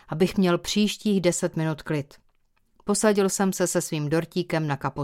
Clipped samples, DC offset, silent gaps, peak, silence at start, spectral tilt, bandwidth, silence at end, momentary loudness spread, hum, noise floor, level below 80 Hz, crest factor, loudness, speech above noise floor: under 0.1%; under 0.1%; none; -6 dBFS; 0.1 s; -5 dB/octave; 16.5 kHz; 0 s; 8 LU; none; -65 dBFS; -54 dBFS; 20 dB; -24 LUFS; 41 dB